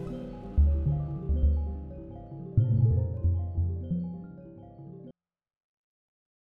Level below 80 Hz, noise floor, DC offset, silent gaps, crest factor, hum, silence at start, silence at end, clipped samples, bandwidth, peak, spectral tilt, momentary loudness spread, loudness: -34 dBFS; -53 dBFS; under 0.1%; none; 18 dB; none; 0 s; 1.45 s; under 0.1%; 3.3 kHz; -12 dBFS; -12 dB/octave; 21 LU; -29 LUFS